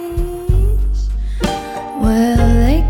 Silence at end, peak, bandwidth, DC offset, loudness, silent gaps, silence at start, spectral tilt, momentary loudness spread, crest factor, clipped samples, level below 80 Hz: 0 s; -2 dBFS; 16.5 kHz; under 0.1%; -17 LUFS; none; 0 s; -7 dB/octave; 10 LU; 12 dB; under 0.1%; -16 dBFS